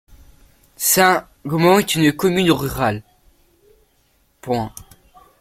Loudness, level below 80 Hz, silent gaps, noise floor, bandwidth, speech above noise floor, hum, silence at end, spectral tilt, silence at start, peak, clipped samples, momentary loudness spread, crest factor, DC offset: -17 LUFS; -48 dBFS; none; -61 dBFS; 16.5 kHz; 44 dB; none; 0.6 s; -4 dB/octave; 0.8 s; -2 dBFS; under 0.1%; 11 LU; 18 dB; under 0.1%